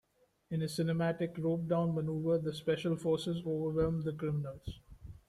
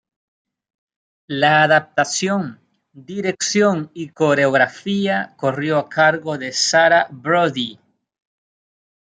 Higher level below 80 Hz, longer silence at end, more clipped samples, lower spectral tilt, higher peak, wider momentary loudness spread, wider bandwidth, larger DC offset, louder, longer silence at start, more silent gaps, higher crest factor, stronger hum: first, -58 dBFS vs -68 dBFS; second, 0.15 s vs 1.45 s; neither; first, -7.5 dB/octave vs -3.5 dB/octave; second, -20 dBFS vs -2 dBFS; about the same, 9 LU vs 11 LU; first, 13 kHz vs 9.6 kHz; neither; second, -35 LUFS vs -17 LUFS; second, 0.5 s vs 1.3 s; neither; about the same, 14 dB vs 18 dB; neither